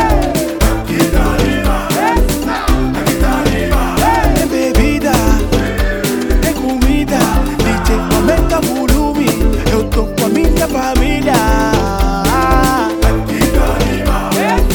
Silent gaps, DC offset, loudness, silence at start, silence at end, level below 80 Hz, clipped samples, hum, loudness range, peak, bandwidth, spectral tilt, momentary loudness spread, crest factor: none; under 0.1%; -13 LUFS; 0 s; 0 s; -16 dBFS; under 0.1%; none; 1 LU; 0 dBFS; over 20 kHz; -5 dB/octave; 3 LU; 12 dB